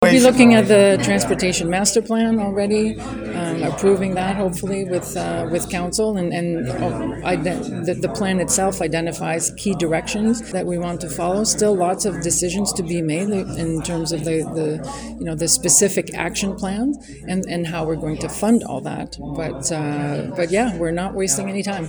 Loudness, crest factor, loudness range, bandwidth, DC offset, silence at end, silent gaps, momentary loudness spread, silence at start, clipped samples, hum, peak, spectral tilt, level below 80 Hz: -19 LUFS; 20 dB; 3 LU; over 20 kHz; under 0.1%; 0 s; none; 11 LU; 0 s; under 0.1%; none; 0 dBFS; -4.5 dB/octave; -42 dBFS